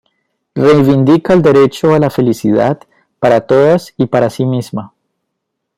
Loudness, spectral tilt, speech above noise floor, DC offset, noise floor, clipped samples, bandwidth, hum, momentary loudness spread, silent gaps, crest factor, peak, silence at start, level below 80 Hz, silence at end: -11 LUFS; -7.5 dB/octave; 63 dB; under 0.1%; -73 dBFS; under 0.1%; 15.5 kHz; none; 9 LU; none; 10 dB; 0 dBFS; 0.55 s; -48 dBFS; 0.9 s